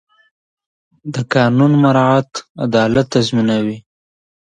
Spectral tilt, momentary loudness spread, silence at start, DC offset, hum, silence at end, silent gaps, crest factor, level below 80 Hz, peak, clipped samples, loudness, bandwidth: -6.5 dB/octave; 14 LU; 1.05 s; under 0.1%; none; 0.8 s; 2.50-2.55 s; 16 dB; -50 dBFS; 0 dBFS; under 0.1%; -14 LUFS; 9.6 kHz